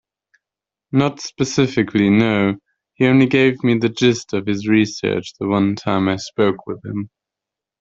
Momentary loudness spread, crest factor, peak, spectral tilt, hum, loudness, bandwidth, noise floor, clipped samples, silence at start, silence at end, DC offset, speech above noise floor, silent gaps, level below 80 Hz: 11 LU; 16 dB; -2 dBFS; -6 dB/octave; none; -18 LUFS; 7.8 kHz; -87 dBFS; under 0.1%; 0.95 s; 0.75 s; under 0.1%; 70 dB; none; -56 dBFS